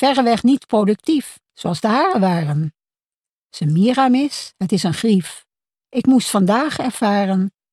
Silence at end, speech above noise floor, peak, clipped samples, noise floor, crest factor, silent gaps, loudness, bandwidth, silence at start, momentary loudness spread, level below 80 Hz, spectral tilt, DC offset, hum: 0.25 s; over 73 dB; -4 dBFS; under 0.1%; under -90 dBFS; 14 dB; 3.06-3.21 s, 3.32-3.42 s; -18 LUFS; 13.5 kHz; 0 s; 10 LU; -60 dBFS; -6 dB/octave; under 0.1%; none